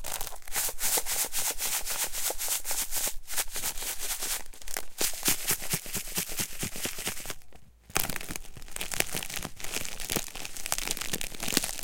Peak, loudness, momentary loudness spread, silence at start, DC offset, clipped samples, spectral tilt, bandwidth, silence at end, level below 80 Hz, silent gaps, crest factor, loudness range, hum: -4 dBFS; -31 LUFS; 10 LU; 0 s; under 0.1%; under 0.1%; -1 dB/octave; 17 kHz; 0 s; -44 dBFS; none; 28 dB; 5 LU; none